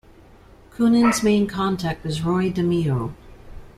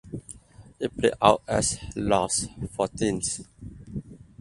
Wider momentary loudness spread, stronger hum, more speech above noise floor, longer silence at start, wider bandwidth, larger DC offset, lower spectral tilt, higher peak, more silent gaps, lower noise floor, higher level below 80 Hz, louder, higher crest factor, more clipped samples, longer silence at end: second, 9 LU vs 20 LU; neither; first, 28 dB vs 23 dB; first, 0.75 s vs 0.05 s; first, 14.5 kHz vs 11.5 kHz; neither; first, -6 dB/octave vs -4 dB/octave; second, -6 dBFS vs -2 dBFS; neither; about the same, -48 dBFS vs -48 dBFS; about the same, -44 dBFS vs -48 dBFS; first, -21 LUFS vs -25 LUFS; second, 16 dB vs 26 dB; neither; second, 0.1 s vs 0.25 s